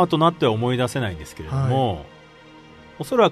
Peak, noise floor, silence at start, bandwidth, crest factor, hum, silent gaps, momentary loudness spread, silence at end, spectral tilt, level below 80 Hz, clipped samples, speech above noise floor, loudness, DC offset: -4 dBFS; -46 dBFS; 0 s; 13.5 kHz; 18 dB; none; none; 14 LU; 0 s; -6.5 dB/octave; -48 dBFS; under 0.1%; 26 dB; -22 LUFS; under 0.1%